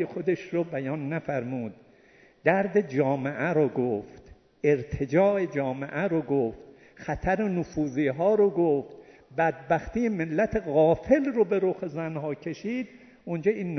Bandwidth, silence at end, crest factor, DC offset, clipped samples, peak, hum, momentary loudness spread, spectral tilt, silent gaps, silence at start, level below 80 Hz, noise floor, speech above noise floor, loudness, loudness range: 6.4 kHz; 0 s; 22 dB; under 0.1%; under 0.1%; -6 dBFS; none; 11 LU; -8 dB/octave; none; 0 s; -52 dBFS; -57 dBFS; 31 dB; -27 LUFS; 2 LU